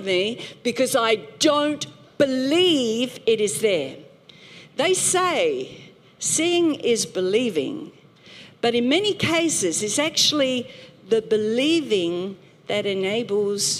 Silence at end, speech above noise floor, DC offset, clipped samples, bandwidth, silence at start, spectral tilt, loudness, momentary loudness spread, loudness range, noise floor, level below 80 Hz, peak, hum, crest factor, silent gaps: 0 s; 26 dB; under 0.1%; under 0.1%; 16 kHz; 0 s; -2.5 dB/octave; -21 LUFS; 11 LU; 2 LU; -47 dBFS; -64 dBFS; -6 dBFS; none; 18 dB; none